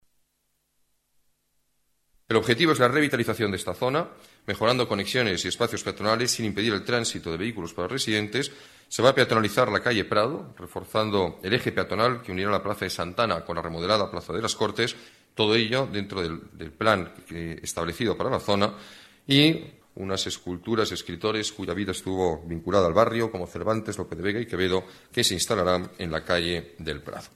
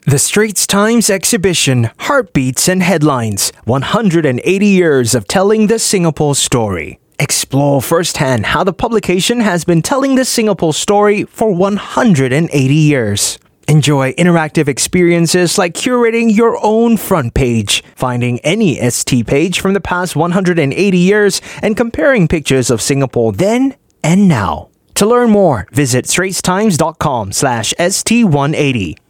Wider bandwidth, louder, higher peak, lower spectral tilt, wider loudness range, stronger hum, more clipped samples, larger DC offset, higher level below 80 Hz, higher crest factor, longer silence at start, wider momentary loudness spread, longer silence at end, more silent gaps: second, 14.5 kHz vs 19 kHz; second, -25 LUFS vs -12 LUFS; second, -6 dBFS vs 0 dBFS; about the same, -4 dB/octave vs -4.5 dB/octave; about the same, 3 LU vs 2 LU; neither; neither; neither; second, -54 dBFS vs -38 dBFS; first, 22 dB vs 12 dB; first, 2.3 s vs 0.05 s; first, 12 LU vs 5 LU; about the same, 0.1 s vs 0.15 s; neither